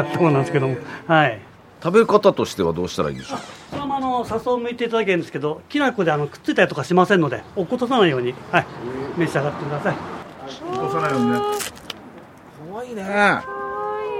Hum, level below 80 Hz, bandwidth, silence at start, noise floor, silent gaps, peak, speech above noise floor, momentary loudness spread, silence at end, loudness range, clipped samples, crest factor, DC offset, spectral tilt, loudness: none; -56 dBFS; 16 kHz; 0 s; -42 dBFS; none; 0 dBFS; 22 dB; 14 LU; 0 s; 4 LU; under 0.1%; 20 dB; under 0.1%; -6 dB/octave; -21 LUFS